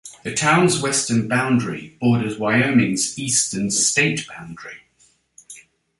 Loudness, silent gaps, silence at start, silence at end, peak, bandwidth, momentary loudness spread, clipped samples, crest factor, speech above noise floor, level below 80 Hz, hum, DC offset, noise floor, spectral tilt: -19 LUFS; none; 0.05 s; 0.4 s; -4 dBFS; 11.5 kHz; 15 LU; under 0.1%; 18 dB; 40 dB; -56 dBFS; none; under 0.1%; -59 dBFS; -3.5 dB/octave